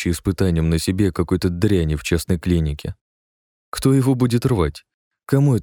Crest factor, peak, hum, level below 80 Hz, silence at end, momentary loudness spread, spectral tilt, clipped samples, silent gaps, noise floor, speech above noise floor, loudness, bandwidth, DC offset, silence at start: 16 dB; -4 dBFS; none; -34 dBFS; 0 s; 6 LU; -6.5 dB/octave; under 0.1%; 3.01-3.72 s, 4.94-5.11 s; under -90 dBFS; over 72 dB; -19 LUFS; 18 kHz; under 0.1%; 0 s